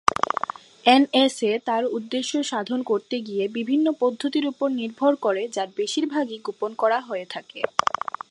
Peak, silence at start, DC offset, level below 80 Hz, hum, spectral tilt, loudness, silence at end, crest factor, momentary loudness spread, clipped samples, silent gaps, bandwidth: 0 dBFS; 0.05 s; under 0.1%; -66 dBFS; none; -3.5 dB/octave; -24 LUFS; 0.4 s; 24 dB; 10 LU; under 0.1%; none; 11.5 kHz